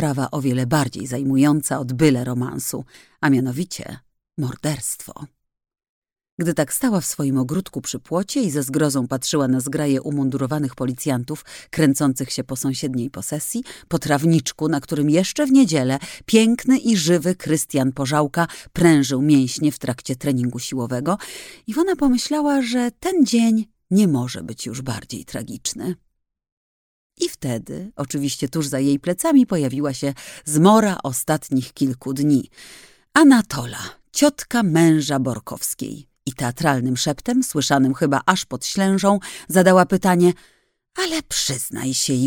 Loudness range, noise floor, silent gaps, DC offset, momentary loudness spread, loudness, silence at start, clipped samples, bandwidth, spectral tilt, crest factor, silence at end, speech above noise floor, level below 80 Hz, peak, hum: 7 LU; under -90 dBFS; 5.89-6.02 s, 6.32-6.38 s, 26.52-27.10 s; under 0.1%; 13 LU; -20 LUFS; 0 s; under 0.1%; 18 kHz; -5 dB/octave; 18 dB; 0 s; over 71 dB; -52 dBFS; 0 dBFS; none